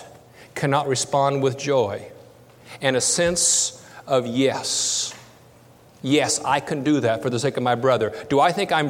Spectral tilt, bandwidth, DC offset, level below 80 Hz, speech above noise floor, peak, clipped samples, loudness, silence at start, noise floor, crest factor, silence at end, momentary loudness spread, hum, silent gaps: -3.5 dB/octave; 17 kHz; under 0.1%; -58 dBFS; 29 dB; -4 dBFS; under 0.1%; -21 LUFS; 0 s; -50 dBFS; 18 dB; 0 s; 7 LU; none; none